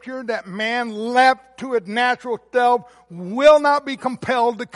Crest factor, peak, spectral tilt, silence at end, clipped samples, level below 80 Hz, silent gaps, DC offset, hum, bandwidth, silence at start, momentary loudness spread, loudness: 16 dB; -2 dBFS; -4.5 dB/octave; 0.1 s; under 0.1%; -60 dBFS; none; under 0.1%; none; 11.5 kHz; 0.05 s; 13 LU; -19 LUFS